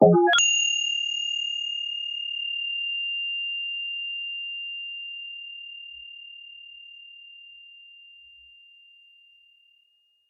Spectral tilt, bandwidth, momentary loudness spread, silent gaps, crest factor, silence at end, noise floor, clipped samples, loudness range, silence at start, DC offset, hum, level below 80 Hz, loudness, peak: -2.5 dB/octave; 8.4 kHz; 25 LU; none; 24 dB; 2.1 s; -66 dBFS; under 0.1%; 22 LU; 0 s; under 0.1%; none; -74 dBFS; -25 LUFS; -4 dBFS